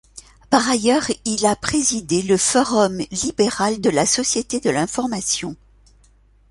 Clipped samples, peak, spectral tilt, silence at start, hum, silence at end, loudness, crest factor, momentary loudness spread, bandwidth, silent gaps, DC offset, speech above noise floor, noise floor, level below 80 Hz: under 0.1%; -2 dBFS; -3 dB/octave; 0.15 s; none; 0.95 s; -19 LUFS; 18 dB; 6 LU; 11.5 kHz; none; under 0.1%; 34 dB; -53 dBFS; -48 dBFS